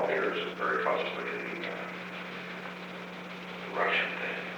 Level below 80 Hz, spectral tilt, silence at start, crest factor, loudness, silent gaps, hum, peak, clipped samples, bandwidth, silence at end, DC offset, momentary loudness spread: -74 dBFS; -5 dB/octave; 0 s; 18 dB; -33 LUFS; none; 60 Hz at -50 dBFS; -16 dBFS; under 0.1%; over 20 kHz; 0 s; under 0.1%; 12 LU